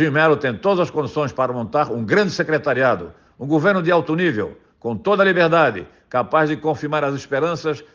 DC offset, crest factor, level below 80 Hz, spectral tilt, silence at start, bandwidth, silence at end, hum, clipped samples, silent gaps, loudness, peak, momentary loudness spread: under 0.1%; 16 dB; -58 dBFS; -6.5 dB/octave; 0 s; 7.4 kHz; 0.1 s; none; under 0.1%; none; -19 LUFS; -4 dBFS; 10 LU